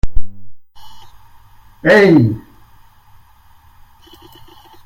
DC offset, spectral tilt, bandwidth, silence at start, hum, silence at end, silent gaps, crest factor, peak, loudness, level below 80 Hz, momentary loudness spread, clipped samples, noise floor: under 0.1%; -7.5 dB/octave; 15 kHz; 0.05 s; none; 2.45 s; none; 16 dB; 0 dBFS; -12 LUFS; -30 dBFS; 20 LU; 0.4%; -46 dBFS